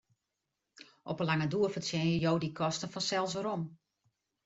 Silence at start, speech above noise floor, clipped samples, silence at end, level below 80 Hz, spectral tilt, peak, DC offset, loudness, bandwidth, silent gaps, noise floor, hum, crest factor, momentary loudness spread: 0.8 s; 54 dB; under 0.1%; 0.7 s; -68 dBFS; -5 dB/octave; -18 dBFS; under 0.1%; -33 LUFS; 8 kHz; none; -86 dBFS; none; 18 dB; 9 LU